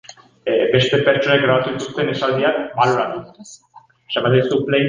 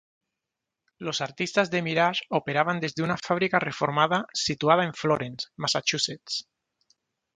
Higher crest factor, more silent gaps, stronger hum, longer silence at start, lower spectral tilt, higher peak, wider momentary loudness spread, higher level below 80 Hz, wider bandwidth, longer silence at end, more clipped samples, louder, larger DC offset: second, 16 dB vs 22 dB; neither; neither; second, 0.1 s vs 1 s; first, -5.5 dB/octave vs -4 dB/octave; first, -2 dBFS vs -6 dBFS; about the same, 10 LU vs 8 LU; first, -56 dBFS vs -66 dBFS; about the same, 9.6 kHz vs 9.6 kHz; second, 0 s vs 0.95 s; neither; first, -17 LUFS vs -26 LUFS; neither